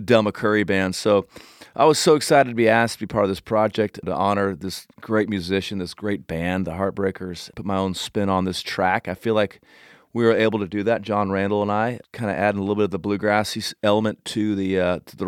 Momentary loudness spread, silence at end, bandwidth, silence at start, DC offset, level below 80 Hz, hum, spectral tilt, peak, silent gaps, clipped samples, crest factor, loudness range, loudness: 9 LU; 0 s; 17 kHz; 0 s; under 0.1%; -54 dBFS; none; -5 dB/octave; -2 dBFS; none; under 0.1%; 20 dB; 6 LU; -22 LUFS